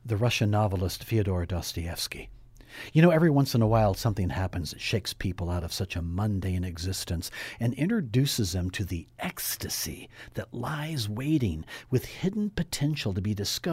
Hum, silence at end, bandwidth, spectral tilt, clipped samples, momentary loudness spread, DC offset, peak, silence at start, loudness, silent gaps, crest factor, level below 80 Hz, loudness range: none; 0 s; 16 kHz; -5.5 dB/octave; under 0.1%; 11 LU; under 0.1%; -6 dBFS; 0.05 s; -28 LUFS; none; 22 dB; -46 dBFS; 6 LU